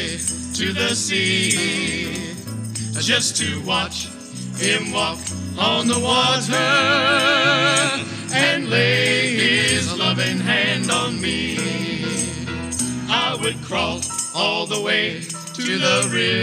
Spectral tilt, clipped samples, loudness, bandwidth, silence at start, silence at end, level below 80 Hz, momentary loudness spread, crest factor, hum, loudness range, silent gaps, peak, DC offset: -2.5 dB/octave; under 0.1%; -19 LUFS; 15 kHz; 0 s; 0 s; -50 dBFS; 10 LU; 16 dB; none; 5 LU; none; -4 dBFS; under 0.1%